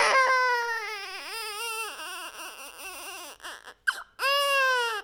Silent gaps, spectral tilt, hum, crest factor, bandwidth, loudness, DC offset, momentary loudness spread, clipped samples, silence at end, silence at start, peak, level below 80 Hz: none; 1.5 dB/octave; none; 20 dB; 18 kHz; -27 LUFS; under 0.1%; 17 LU; under 0.1%; 0 s; 0 s; -10 dBFS; -70 dBFS